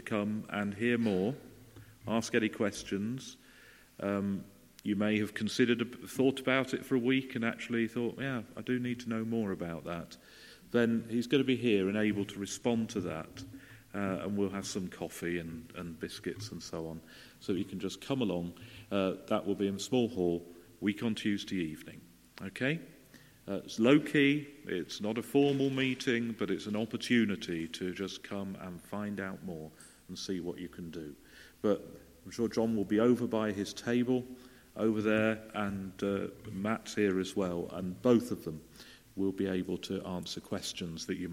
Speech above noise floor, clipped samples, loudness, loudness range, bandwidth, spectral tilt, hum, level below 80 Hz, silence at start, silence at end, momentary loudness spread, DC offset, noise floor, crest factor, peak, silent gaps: 25 dB; under 0.1%; -34 LUFS; 7 LU; 16.5 kHz; -5.5 dB/octave; none; -66 dBFS; 0 s; 0 s; 15 LU; under 0.1%; -58 dBFS; 22 dB; -10 dBFS; none